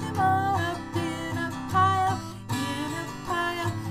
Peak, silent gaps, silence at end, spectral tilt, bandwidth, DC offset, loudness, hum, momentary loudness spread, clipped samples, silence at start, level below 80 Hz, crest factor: -10 dBFS; none; 0 s; -5 dB/octave; 15.5 kHz; under 0.1%; -27 LUFS; none; 9 LU; under 0.1%; 0 s; -52 dBFS; 16 dB